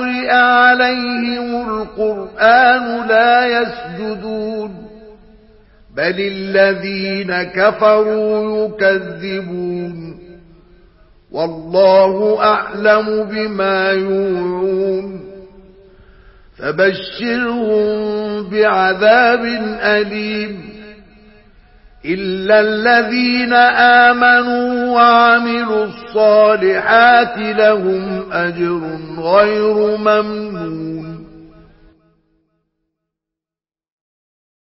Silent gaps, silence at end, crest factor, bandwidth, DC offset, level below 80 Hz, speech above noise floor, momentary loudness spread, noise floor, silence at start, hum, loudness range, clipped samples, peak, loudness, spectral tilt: none; 3.2 s; 14 dB; 5.8 kHz; under 0.1%; -50 dBFS; over 76 dB; 14 LU; under -90 dBFS; 0 s; none; 9 LU; under 0.1%; 0 dBFS; -14 LUFS; -8.5 dB/octave